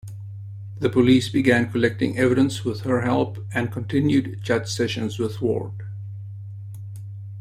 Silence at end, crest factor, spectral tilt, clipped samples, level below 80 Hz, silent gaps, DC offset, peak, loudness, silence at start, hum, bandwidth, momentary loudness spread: 0 s; 20 dB; -6.5 dB/octave; under 0.1%; -54 dBFS; none; under 0.1%; -4 dBFS; -22 LUFS; 0.05 s; none; 14 kHz; 18 LU